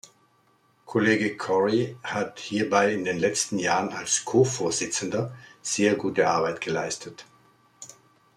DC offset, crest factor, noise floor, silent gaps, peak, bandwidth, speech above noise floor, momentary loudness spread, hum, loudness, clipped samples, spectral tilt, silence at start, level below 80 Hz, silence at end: under 0.1%; 20 dB; -64 dBFS; none; -6 dBFS; 13.5 kHz; 39 dB; 13 LU; none; -25 LUFS; under 0.1%; -4 dB/octave; 0.9 s; -68 dBFS; 0.45 s